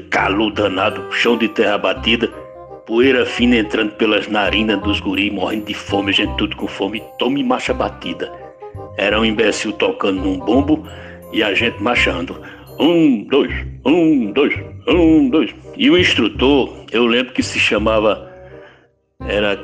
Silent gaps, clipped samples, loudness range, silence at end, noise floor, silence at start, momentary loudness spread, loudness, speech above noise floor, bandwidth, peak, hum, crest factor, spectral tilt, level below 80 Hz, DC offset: none; under 0.1%; 4 LU; 0 s; -52 dBFS; 0 s; 11 LU; -16 LUFS; 36 dB; 12.5 kHz; -2 dBFS; none; 14 dB; -5 dB/octave; -36 dBFS; under 0.1%